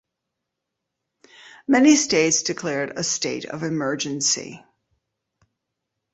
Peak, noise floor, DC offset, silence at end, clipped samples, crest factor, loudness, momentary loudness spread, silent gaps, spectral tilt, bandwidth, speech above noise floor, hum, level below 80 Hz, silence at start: -4 dBFS; -82 dBFS; under 0.1%; 1.55 s; under 0.1%; 20 dB; -21 LUFS; 12 LU; none; -3 dB/octave; 8.2 kHz; 61 dB; none; -64 dBFS; 1.45 s